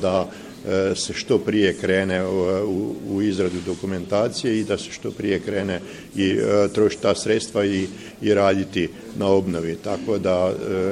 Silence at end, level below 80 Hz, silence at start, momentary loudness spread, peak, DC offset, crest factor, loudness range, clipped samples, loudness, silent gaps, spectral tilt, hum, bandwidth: 0 s; -54 dBFS; 0 s; 8 LU; -4 dBFS; under 0.1%; 18 dB; 3 LU; under 0.1%; -22 LUFS; none; -5.5 dB/octave; none; 14.5 kHz